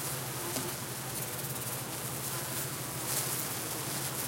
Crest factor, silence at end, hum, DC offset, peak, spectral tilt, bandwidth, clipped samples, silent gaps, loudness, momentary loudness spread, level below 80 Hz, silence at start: 22 dB; 0 s; none; under 0.1%; -16 dBFS; -2.5 dB/octave; 17 kHz; under 0.1%; none; -34 LUFS; 4 LU; -64 dBFS; 0 s